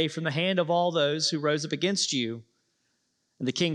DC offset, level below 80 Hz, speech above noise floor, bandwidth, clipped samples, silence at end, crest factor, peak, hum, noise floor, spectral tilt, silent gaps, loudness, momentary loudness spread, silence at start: under 0.1%; -80 dBFS; 48 dB; 11.5 kHz; under 0.1%; 0 s; 16 dB; -12 dBFS; none; -75 dBFS; -4 dB/octave; none; -27 LUFS; 8 LU; 0 s